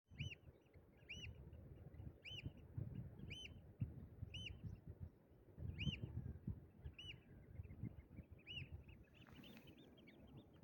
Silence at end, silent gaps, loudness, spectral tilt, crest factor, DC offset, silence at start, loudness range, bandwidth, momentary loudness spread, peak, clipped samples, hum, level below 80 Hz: 0 s; none; -55 LUFS; -5.5 dB/octave; 24 dB; under 0.1%; 0.1 s; 5 LU; 17 kHz; 12 LU; -30 dBFS; under 0.1%; none; -64 dBFS